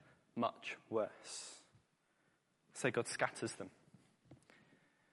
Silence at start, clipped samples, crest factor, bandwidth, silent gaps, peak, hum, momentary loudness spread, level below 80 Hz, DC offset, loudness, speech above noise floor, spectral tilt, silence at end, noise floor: 0.35 s; under 0.1%; 26 dB; 11.5 kHz; none; -20 dBFS; none; 15 LU; -88 dBFS; under 0.1%; -42 LUFS; 37 dB; -4 dB/octave; 0.8 s; -78 dBFS